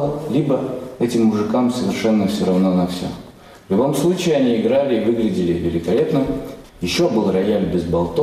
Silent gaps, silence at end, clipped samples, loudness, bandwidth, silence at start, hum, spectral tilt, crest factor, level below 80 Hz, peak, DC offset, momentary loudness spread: none; 0 s; under 0.1%; -18 LUFS; 15 kHz; 0 s; none; -6.5 dB/octave; 10 dB; -44 dBFS; -8 dBFS; under 0.1%; 7 LU